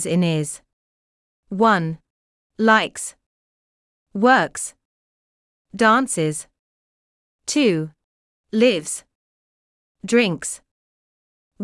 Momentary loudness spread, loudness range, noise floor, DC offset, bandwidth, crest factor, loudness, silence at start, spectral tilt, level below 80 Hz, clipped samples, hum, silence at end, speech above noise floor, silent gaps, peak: 17 LU; 3 LU; under -90 dBFS; under 0.1%; 12 kHz; 20 dB; -19 LUFS; 0 s; -4.5 dB/octave; -64 dBFS; under 0.1%; none; 0 s; over 71 dB; 0.73-1.43 s, 2.10-2.50 s, 3.26-4.06 s, 4.85-5.65 s, 6.59-7.39 s, 8.04-8.44 s, 9.15-9.95 s, 10.71-11.51 s; -4 dBFS